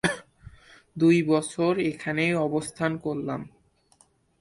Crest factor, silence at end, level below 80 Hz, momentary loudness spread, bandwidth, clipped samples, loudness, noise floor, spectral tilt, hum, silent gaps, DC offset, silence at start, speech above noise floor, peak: 18 dB; 0.95 s; -60 dBFS; 15 LU; 11.5 kHz; under 0.1%; -25 LUFS; -63 dBFS; -6 dB/octave; none; none; under 0.1%; 0.05 s; 38 dB; -10 dBFS